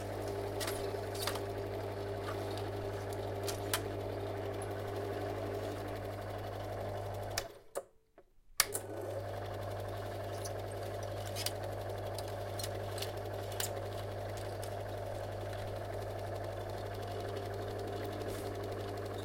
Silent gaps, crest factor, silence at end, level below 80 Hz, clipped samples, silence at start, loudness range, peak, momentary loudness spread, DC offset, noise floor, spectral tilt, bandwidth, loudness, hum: none; 34 dB; 0 s; -56 dBFS; under 0.1%; 0 s; 2 LU; -6 dBFS; 4 LU; under 0.1%; -64 dBFS; -4.5 dB/octave; 16.5 kHz; -40 LUFS; none